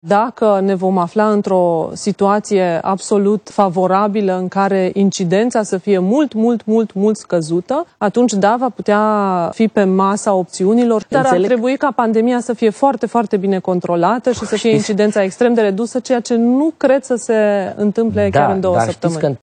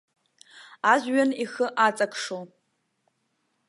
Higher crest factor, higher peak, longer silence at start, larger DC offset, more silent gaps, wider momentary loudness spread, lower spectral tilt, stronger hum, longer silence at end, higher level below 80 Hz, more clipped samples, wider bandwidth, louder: second, 14 dB vs 22 dB; first, 0 dBFS vs -6 dBFS; second, 0.05 s vs 0.55 s; neither; neither; second, 4 LU vs 12 LU; first, -6 dB/octave vs -3.5 dB/octave; neither; second, 0.05 s vs 1.2 s; first, -60 dBFS vs -84 dBFS; neither; second, 10 kHz vs 11.5 kHz; first, -15 LUFS vs -24 LUFS